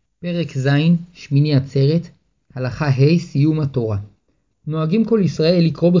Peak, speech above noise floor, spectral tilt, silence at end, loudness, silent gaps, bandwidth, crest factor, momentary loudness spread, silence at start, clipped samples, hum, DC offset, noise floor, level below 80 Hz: -4 dBFS; 49 dB; -8 dB/octave; 0 s; -18 LUFS; none; 7.4 kHz; 14 dB; 11 LU; 0.2 s; under 0.1%; none; under 0.1%; -66 dBFS; -48 dBFS